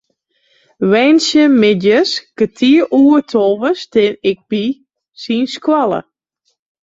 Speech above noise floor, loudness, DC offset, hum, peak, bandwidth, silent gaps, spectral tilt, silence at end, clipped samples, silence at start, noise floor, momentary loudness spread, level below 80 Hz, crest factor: 55 dB; -13 LUFS; under 0.1%; none; -2 dBFS; 7.8 kHz; none; -5 dB/octave; 0.85 s; under 0.1%; 0.8 s; -67 dBFS; 9 LU; -58 dBFS; 12 dB